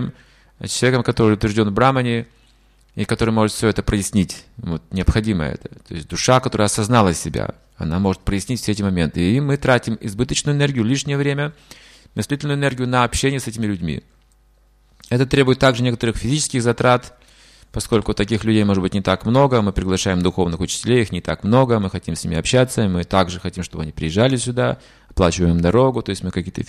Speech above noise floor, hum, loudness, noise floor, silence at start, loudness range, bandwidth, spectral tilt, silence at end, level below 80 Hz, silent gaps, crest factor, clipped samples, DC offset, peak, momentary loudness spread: 36 dB; none; -19 LUFS; -55 dBFS; 0 s; 3 LU; 14.5 kHz; -5.5 dB/octave; 0.05 s; -36 dBFS; none; 16 dB; under 0.1%; under 0.1%; -2 dBFS; 12 LU